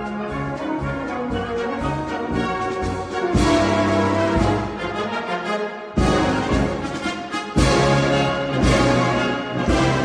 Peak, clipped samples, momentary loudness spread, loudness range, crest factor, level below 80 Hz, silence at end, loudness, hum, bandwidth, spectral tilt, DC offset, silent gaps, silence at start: -2 dBFS; under 0.1%; 8 LU; 3 LU; 18 dB; -32 dBFS; 0 s; -21 LUFS; none; 13 kHz; -5.5 dB/octave; under 0.1%; none; 0 s